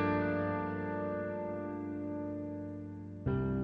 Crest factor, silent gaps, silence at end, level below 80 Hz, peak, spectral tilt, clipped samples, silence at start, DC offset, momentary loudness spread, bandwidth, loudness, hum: 16 dB; none; 0 s; -56 dBFS; -20 dBFS; -10 dB/octave; under 0.1%; 0 s; under 0.1%; 9 LU; 5.2 kHz; -37 LUFS; none